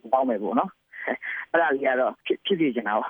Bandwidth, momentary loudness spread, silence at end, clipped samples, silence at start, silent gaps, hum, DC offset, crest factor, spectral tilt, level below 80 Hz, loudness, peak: over 20 kHz; 8 LU; 0 s; under 0.1%; 0.05 s; none; none; under 0.1%; 18 dB; -8 dB/octave; -76 dBFS; -25 LUFS; -8 dBFS